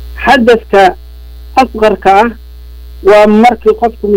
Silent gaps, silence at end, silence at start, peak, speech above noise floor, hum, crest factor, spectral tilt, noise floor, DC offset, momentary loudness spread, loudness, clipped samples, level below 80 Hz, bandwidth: none; 0 s; 0 s; 0 dBFS; 22 dB; 60 Hz at -30 dBFS; 8 dB; -5.5 dB/octave; -28 dBFS; under 0.1%; 7 LU; -8 LUFS; 0.7%; -28 dBFS; 16.5 kHz